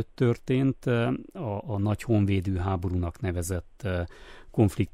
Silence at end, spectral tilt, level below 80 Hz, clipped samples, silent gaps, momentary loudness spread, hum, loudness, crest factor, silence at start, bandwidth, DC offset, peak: 0.05 s; -7.5 dB/octave; -46 dBFS; under 0.1%; none; 8 LU; none; -28 LUFS; 16 dB; 0 s; 15 kHz; under 0.1%; -10 dBFS